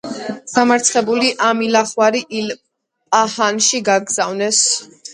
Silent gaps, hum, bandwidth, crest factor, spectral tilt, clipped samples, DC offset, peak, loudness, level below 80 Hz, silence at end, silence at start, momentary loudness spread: none; none; 11.5 kHz; 16 dB; -1.5 dB/octave; under 0.1%; under 0.1%; 0 dBFS; -15 LUFS; -66 dBFS; 0 s; 0.05 s; 10 LU